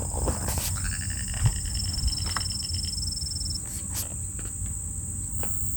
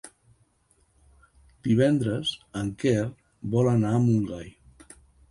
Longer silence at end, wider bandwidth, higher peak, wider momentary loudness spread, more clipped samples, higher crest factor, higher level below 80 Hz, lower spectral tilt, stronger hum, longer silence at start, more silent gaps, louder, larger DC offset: second, 0 s vs 0.8 s; first, over 20 kHz vs 11.5 kHz; about the same, -10 dBFS vs -10 dBFS; second, 5 LU vs 13 LU; neither; about the same, 20 dB vs 16 dB; first, -36 dBFS vs -54 dBFS; second, -3 dB/octave vs -7 dB/octave; neither; about the same, 0 s vs 0.05 s; neither; second, -28 LUFS vs -25 LUFS; neither